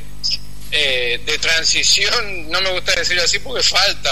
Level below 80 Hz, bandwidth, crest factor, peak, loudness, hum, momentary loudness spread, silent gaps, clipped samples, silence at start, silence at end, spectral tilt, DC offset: -38 dBFS; 13.5 kHz; 16 dB; -2 dBFS; -15 LUFS; 50 Hz at -35 dBFS; 8 LU; none; under 0.1%; 0 s; 0 s; 0 dB/octave; 7%